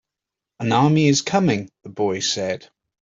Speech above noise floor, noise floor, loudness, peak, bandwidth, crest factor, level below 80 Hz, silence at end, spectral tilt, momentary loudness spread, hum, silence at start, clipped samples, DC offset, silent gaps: 66 dB; -86 dBFS; -20 LUFS; -4 dBFS; 7.8 kHz; 18 dB; -60 dBFS; 0.6 s; -5 dB/octave; 12 LU; none; 0.6 s; under 0.1%; under 0.1%; none